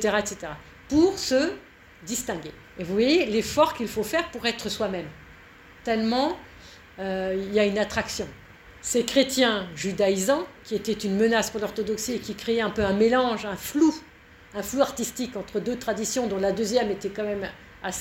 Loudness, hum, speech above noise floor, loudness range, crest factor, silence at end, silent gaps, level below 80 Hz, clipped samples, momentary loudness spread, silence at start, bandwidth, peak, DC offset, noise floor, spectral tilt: -25 LUFS; none; 24 dB; 3 LU; 20 dB; 0 s; none; -52 dBFS; under 0.1%; 14 LU; 0 s; 16.5 kHz; -6 dBFS; under 0.1%; -49 dBFS; -4 dB/octave